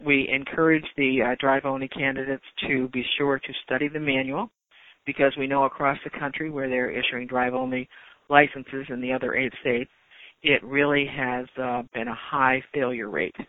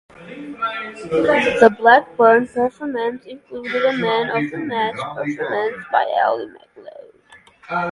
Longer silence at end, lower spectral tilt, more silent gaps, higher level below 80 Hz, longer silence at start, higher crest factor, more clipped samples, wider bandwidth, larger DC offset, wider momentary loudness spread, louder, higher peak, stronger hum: about the same, 0.05 s vs 0 s; first, -8.5 dB/octave vs -5.5 dB/octave; neither; about the same, -58 dBFS vs -58 dBFS; second, 0 s vs 0.2 s; about the same, 24 dB vs 20 dB; neither; second, 4 kHz vs 11 kHz; neither; second, 10 LU vs 17 LU; second, -25 LUFS vs -18 LUFS; about the same, 0 dBFS vs 0 dBFS; neither